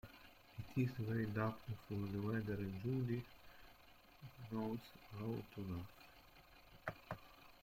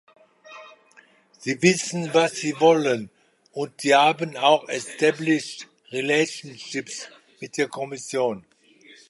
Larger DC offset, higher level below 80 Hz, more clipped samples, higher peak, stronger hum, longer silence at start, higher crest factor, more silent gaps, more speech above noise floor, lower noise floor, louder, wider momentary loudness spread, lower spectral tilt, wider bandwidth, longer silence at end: neither; about the same, -68 dBFS vs -72 dBFS; neither; second, -28 dBFS vs -2 dBFS; neither; second, 0.05 s vs 0.5 s; about the same, 18 dB vs 22 dB; neither; second, 22 dB vs 33 dB; first, -65 dBFS vs -56 dBFS; second, -45 LUFS vs -22 LUFS; about the same, 21 LU vs 20 LU; first, -8 dB/octave vs -4 dB/octave; first, 16.5 kHz vs 11.5 kHz; second, 0.05 s vs 0.7 s